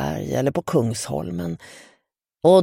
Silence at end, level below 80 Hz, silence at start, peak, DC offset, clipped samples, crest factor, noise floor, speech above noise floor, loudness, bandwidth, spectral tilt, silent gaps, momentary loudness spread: 0 s; -50 dBFS; 0 s; -2 dBFS; under 0.1%; under 0.1%; 18 dB; -69 dBFS; 45 dB; -23 LUFS; 16.5 kHz; -6 dB/octave; none; 11 LU